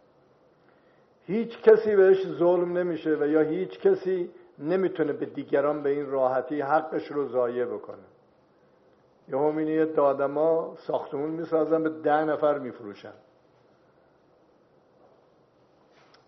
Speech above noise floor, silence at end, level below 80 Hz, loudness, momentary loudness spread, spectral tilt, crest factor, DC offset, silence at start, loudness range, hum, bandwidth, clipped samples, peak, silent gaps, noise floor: 36 dB; 3.15 s; -78 dBFS; -25 LUFS; 12 LU; -6 dB/octave; 22 dB; under 0.1%; 1.3 s; 7 LU; none; 5.8 kHz; under 0.1%; -4 dBFS; none; -61 dBFS